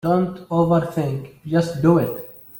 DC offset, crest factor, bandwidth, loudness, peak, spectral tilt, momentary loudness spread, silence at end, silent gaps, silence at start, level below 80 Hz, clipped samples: under 0.1%; 16 dB; 17 kHz; -20 LUFS; -4 dBFS; -8.5 dB/octave; 9 LU; 0 s; none; 0.05 s; -52 dBFS; under 0.1%